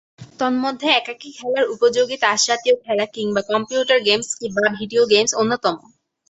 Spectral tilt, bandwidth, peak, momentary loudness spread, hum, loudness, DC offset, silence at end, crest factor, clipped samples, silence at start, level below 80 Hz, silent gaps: -2 dB/octave; 8.2 kHz; -2 dBFS; 8 LU; none; -18 LUFS; under 0.1%; 0.5 s; 18 dB; under 0.1%; 0.2 s; -62 dBFS; none